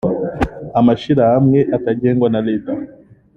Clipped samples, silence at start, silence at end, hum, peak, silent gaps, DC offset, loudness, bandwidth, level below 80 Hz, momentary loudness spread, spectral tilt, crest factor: under 0.1%; 0.05 s; 0.5 s; none; -2 dBFS; none; under 0.1%; -15 LUFS; 7 kHz; -40 dBFS; 11 LU; -9.5 dB/octave; 14 dB